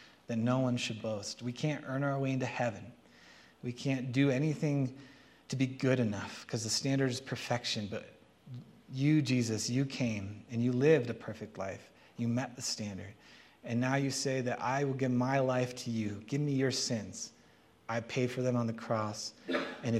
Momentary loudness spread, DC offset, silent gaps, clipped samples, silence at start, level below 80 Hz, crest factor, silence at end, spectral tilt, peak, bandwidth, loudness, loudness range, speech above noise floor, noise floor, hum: 14 LU; under 0.1%; none; under 0.1%; 0 s; -74 dBFS; 20 dB; 0 s; -5.5 dB/octave; -14 dBFS; 13.5 kHz; -34 LUFS; 4 LU; 30 dB; -63 dBFS; none